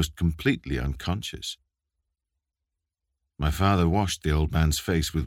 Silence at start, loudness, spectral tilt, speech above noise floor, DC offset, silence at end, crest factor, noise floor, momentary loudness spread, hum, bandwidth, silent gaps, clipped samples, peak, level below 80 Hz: 0 s; -26 LUFS; -5.5 dB/octave; 60 dB; under 0.1%; 0 s; 20 dB; -86 dBFS; 10 LU; none; 16.5 kHz; none; under 0.1%; -6 dBFS; -34 dBFS